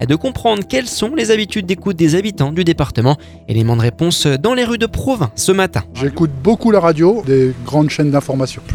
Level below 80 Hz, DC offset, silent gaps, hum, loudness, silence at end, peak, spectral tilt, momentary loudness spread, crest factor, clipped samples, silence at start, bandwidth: -38 dBFS; under 0.1%; none; none; -15 LUFS; 0 s; 0 dBFS; -5.5 dB/octave; 6 LU; 14 dB; under 0.1%; 0 s; 18 kHz